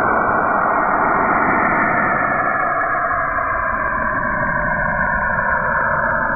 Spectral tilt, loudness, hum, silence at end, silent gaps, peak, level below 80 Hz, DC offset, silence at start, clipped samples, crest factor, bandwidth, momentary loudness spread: -10.5 dB/octave; -17 LUFS; none; 0 s; none; -4 dBFS; -36 dBFS; under 0.1%; 0 s; under 0.1%; 14 dB; 2.6 kHz; 3 LU